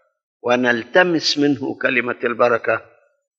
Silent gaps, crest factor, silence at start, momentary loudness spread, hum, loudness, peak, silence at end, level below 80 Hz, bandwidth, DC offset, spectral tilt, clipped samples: none; 16 dB; 0.45 s; 7 LU; none; -18 LUFS; -2 dBFS; 0.55 s; -70 dBFS; 7.8 kHz; under 0.1%; -4 dB/octave; under 0.1%